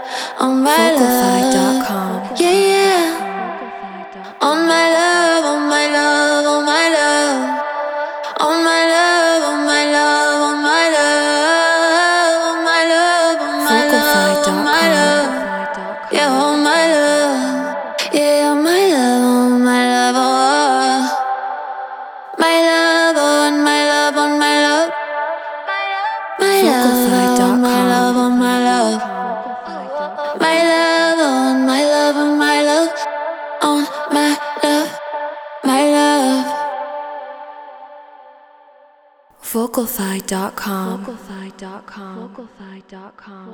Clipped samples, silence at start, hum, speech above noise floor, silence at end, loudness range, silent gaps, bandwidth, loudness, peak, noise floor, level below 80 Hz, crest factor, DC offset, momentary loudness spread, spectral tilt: under 0.1%; 0 s; none; 33 dB; 0 s; 10 LU; none; 20 kHz; -14 LUFS; 0 dBFS; -50 dBFS; -60 dBFS; 14 dB; under 0.1%; 13 LU; -3 dB/octave